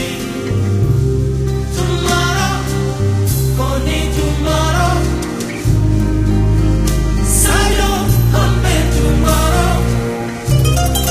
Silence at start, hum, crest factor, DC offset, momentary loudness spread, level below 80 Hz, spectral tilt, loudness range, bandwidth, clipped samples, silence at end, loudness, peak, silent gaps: 0 s; none; 14 dB; under 0.1%; 5 LU; -18 dBFS; -5 dB/octave; 3 LU; 15.5 kHz; under 0.1%; 0 s; -15 LUFS; 0 dBFS; none